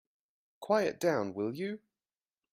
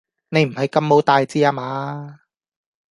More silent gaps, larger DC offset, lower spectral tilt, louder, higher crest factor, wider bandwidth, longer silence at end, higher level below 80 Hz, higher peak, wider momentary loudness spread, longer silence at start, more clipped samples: neither; neither; about the same, -5.5 dB/octave vs -6.5 dB/octave; second, -33 LUFS vs -18 LUFS; about the same, 20 dB vs 18 dB; first, 16 kHz vs 11.5 kHz; about the same, 0.75 s vs 0.75 s; second, -78 dBFS vs -64 dBFS; second, -16 dBFS vs -2 dBFS; about the same, 14 LU vs 15 LU; first, 0.6 s vs 0.3 s; neither